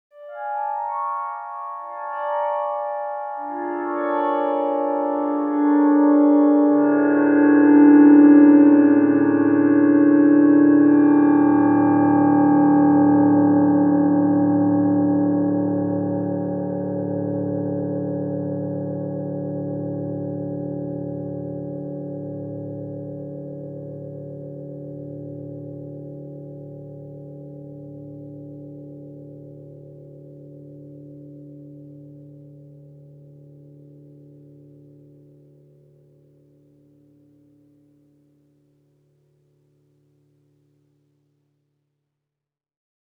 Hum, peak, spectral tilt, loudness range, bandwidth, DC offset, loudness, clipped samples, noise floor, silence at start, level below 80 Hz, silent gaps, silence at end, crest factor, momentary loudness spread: none; -2 dBFS; -12.5 dB/octave; 24 LU; 2.9 kHz; under 0.1%; -18 LUFS; under 0.1%; -87 dBFS; 0.2 s; -68 dBFS; none; 10.85 s; 18 dB; 23 LU